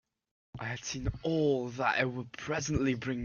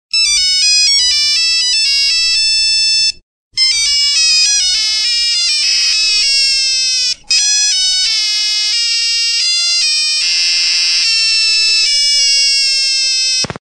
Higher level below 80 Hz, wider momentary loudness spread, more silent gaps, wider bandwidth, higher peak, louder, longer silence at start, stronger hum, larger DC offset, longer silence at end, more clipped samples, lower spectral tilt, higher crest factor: about the same, -50 dBFS vs -46 dBFS; first, 10 LU vs 3 LU; second, none vs 3.23-3.51 s; second, 7.2 kHz vs 14 kHz; second, -14 dBFS vs 0 dBFS; second, -33 LUFS vs -9 LUFS; first, 0.55 s vs 0.15 s; neither; neither; about the same, 0 s vs 0.05 s; neither; first, -5 dB/octave vs 3 dB/octave; first, 20 dB vs 12 dB